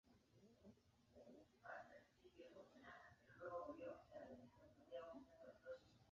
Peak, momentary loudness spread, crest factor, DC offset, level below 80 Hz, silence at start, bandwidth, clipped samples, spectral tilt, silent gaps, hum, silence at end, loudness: -42 dBFS; 13 LU; 20 dB; under 0.1%; -84 dBFS; 0.05 s; 7.2 kHz; under 0.1%; -4 dB/octave; none; none; 0 s; -60 LUFS